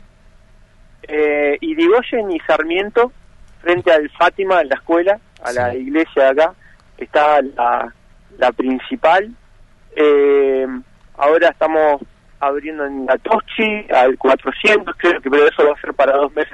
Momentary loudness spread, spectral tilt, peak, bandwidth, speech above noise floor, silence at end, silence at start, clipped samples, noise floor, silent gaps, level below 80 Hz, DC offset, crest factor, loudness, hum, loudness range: 9 LU; -5 dB/octave; 0 dBFS; 11 kHz; 31 dB; 0.05 s; 1.05 s; under 0.1%; -46 dBFS; none; -48 dBFS; under 0.1%; 16 dB; -15 LUFS; none; 3 LU